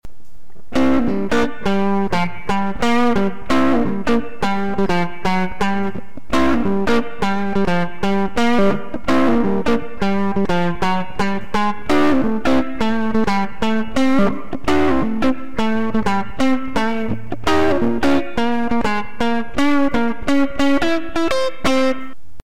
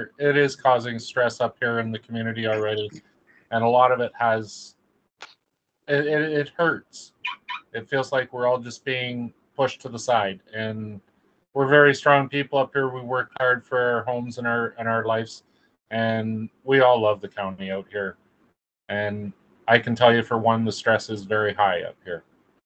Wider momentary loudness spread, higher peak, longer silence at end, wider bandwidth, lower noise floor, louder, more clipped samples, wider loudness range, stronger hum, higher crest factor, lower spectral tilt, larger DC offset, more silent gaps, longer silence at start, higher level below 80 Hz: second, 5 LU vs 15 LU; second, -6 dBFS vs 0 dBFS; second, 0.1 s vs 0.45 s; first, 15.5 kHz vs 8.8 kHz; second, -47 dBFS vs -76 dBFS; first, -19 LUFS vs -23 LUFS; neither; second, 1 LU vs 5 LU; neither; second, 10 dB vs 22 dB; about the same, -6 dB/octave vs -5.5 dB/octave; first, 10% vs under 0.1%; neither; about the same, 0 s vs 0 s; first, -38 dBFS vs -68 dBFS